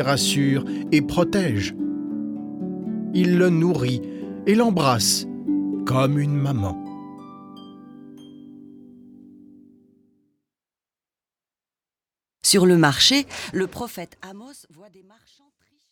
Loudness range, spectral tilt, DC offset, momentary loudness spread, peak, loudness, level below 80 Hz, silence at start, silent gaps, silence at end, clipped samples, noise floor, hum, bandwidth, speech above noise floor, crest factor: 7 LU; -4.5 dB/octave; under 0.1%; 22 LU; -2 dBFS; -21 LUFS; -54 dBFS; 0 s; none; 1.35 s; under 0.1%; under -90 dBFS; none; 19 kHz; over 70 dB; 20 dB